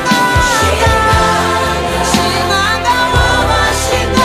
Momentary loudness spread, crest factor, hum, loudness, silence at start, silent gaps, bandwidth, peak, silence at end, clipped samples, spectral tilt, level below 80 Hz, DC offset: 3 LU; 12 dB; none; -11 LUFS; 0 s; none; 15.5 kHz; 0 dBFS; 0 s; under 0.1%; -3.5 dB/octave; -22 dBFS; under 0.1%